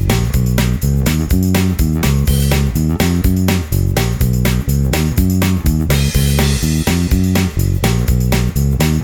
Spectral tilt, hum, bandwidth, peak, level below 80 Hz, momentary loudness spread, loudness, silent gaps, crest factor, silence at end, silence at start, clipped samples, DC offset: -5.5 dB/octave; none; over 20 kHz; 0 dBFS; -20 dBFS; 2 LU; -15 LUFS; none; 12 dB; 0 s; 0 s; under 0.1%; under 0.1%